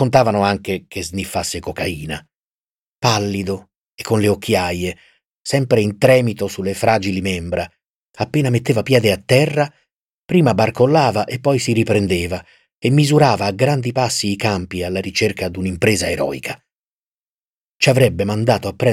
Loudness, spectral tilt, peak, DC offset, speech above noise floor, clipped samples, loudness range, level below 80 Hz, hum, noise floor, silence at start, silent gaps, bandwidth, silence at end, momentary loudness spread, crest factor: -17 LUFS; -5.5 dB/octave; -2 dBFS; under 0.1%; over 73 dB; under 0.1%; 5 LU; -46 dBFS; none; under -90 dBFS; 0 s; 2.43-2.52 s, 2.60-2.99 s, 3.78-3.98 s, 5.25-5.45 s, 7.89-8.13 s, 10.02-10.29 s, 12.74-12.82 s, 16.75-17.76 s; 16.5 kHz; 0 s; 12 LU; 16 dB